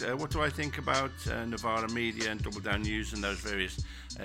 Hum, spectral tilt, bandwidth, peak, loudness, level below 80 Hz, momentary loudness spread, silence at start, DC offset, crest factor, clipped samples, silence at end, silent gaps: none; -4.5 dB/octave; 16.5 kHz; -12 dBFS; -33 LUFS; -44 dBFS; 5 LU; 0 s; under 0.1%; 20 dB; under 0.1%; 0 s; none